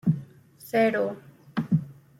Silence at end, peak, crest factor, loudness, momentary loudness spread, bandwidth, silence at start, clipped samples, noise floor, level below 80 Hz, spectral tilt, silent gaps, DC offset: 0.3 s; -12 dBFS; 16 dB; -27 LUFS; 15 LU; 16 kHz; 0.05 s; under 0.1%; -50 dBFS; -66 dBFS; -8 dB/octave; none; under 0.1%